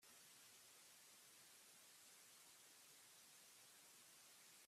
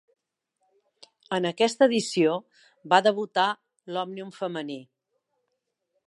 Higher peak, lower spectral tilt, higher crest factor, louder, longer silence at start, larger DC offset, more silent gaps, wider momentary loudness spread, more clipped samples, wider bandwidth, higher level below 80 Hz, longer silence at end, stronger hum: second, -54 dBFS vs -4 dBFS; second, 0.5 dB/octave vs -4 dB/octave; second, 14 dB vs 24 dB; second, -65 LUFS vs -25 LUFS; second, 0 s vs 1.3 s; neither; neither; second, 0 LU vs 14 LU; neither; first, 15.5 kHz vs 11.5 kHz; second, under -90 dBFS vs -82 dBFS; second, 0 s vs 1.25 s; neither